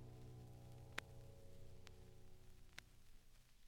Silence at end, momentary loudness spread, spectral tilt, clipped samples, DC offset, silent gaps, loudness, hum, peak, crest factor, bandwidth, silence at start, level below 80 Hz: 0 s; 13 LU; -4 dB/octave; under 0.1%; under 0.1%; none; -60 LUFS; none; -24 dBFS; 34 dB; 17 kHz; 0 s; -64 dBFS